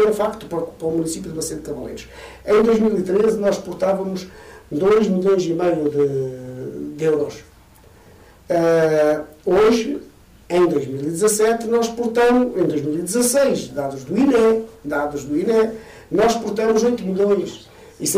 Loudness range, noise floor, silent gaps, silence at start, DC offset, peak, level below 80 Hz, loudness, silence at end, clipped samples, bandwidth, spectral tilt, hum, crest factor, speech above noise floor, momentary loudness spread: 3 LU; -48 dBFS; none; 0 s; under 0.1%; -8 dBFS; -50 dBFS; -19 LUFS; 0 s; under 0.1%; 16 kHz; -5 dB/octave; none; 10 dB; 29 dB; 13 LU